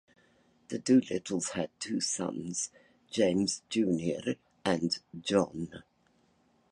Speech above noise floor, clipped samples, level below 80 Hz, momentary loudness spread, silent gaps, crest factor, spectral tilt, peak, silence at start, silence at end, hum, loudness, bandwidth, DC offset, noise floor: 39 dB; under 0.1%; -66 dBFS; 11 LU; none; 20 dB; -4.5 dB/octave; -12 dBFS; 0.7 s; 0.9 s; none; -31 LUFS; 11.5 kHz; under 0.1%; -69 dBFS